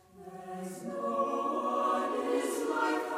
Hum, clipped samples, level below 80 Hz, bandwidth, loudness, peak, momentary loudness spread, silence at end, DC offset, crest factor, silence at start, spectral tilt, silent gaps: none; under 0.1%; -76 dBFS; 16 kHz; -32 LUFS; -18 dBFS; 12 LU; 0 s; under 0.1%; 14 dB; 0.15 s; -4.5 dB/octave; none